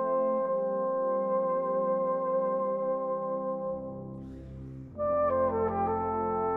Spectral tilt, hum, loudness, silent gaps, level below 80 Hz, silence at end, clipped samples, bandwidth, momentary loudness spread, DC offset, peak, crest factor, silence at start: -11 dB/octave; none; -30 LUFS; none; -56 dBFS; 0 s; under 0.1%; 2.8 kHz; 14 LU; under 0.1%; -18 dBFS; 12 dB; 0 s